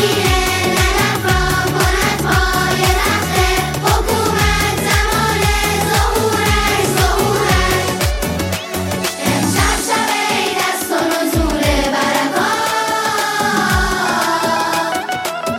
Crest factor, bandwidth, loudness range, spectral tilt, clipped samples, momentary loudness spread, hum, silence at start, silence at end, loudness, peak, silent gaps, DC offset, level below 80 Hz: 14 dB; 16.5 kHz; 2 LU; -3.5 dB/octave; under 0.1%; 4 LU; none; 0 s; 0 s; -15 LUFS; 0 dBFS; none; under 0.1%; -24 dBFS